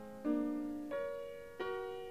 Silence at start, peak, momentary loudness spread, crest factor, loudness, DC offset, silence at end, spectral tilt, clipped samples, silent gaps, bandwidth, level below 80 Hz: 0 s; -24 dBFS; 8 LU; 18 dB; -41 LUFS; 0.1%; 0 s; -6 dB/octave; under 0.1%; none; 15.5 kHz; -70 dBFS